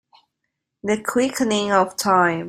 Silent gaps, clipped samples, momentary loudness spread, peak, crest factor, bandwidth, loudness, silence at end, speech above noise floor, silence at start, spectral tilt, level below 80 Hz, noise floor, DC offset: none; under 0.1%; 7 LU; -2 dBFS; 18 dB; 16 kHz; -20 LUFS; 0 s; 59 dB; 0.85 s; -4 dB/octave; -60 dBFS; -79 dBFS; under 0.1%